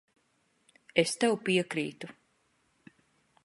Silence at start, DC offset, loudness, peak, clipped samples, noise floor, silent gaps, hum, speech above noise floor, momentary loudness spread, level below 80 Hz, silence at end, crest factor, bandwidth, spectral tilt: 0.95 s; under 0.1%; -29 LUFS; -8 dBFS; under 0.1%; -73 dBFS; none; none; 43 dB; 17 LU; -78 dBFS; 1.35 s; 26 dB; 11.5 kHz; -4 dB/octave